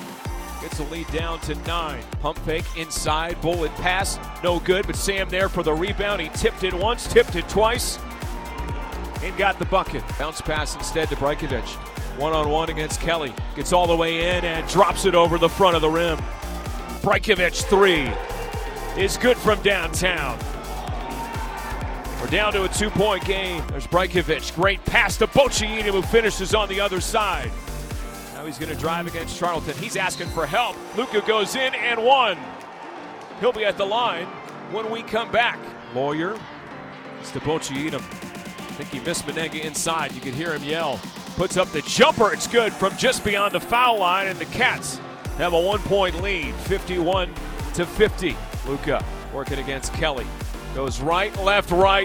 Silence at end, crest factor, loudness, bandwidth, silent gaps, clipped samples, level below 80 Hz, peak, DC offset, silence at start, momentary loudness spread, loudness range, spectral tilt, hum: 0 s; 20 dB; -22 LUFS; 19.5 kHz; none; under 0.1%; -34 dBFS; -2 dBFS; under 0.1%; 0 s; 14 LU; 6 LU; -4 dB/octave; none